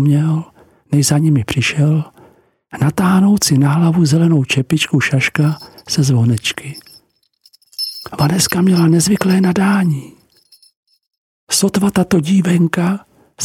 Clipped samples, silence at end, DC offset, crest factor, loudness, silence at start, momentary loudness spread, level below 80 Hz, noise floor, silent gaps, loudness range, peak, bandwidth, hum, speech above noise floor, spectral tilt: under 0.1%; 0 s; under 0.1%; 14 dB; -14 LUFS; 0 s; 11 LU; -48 dBFS; -55 dBFS; 10.77-10.83 s, 11.18-11.47 s; 3 LU; 0 dBFS; 17 kHz; none; 42 dB; -5 dB/octave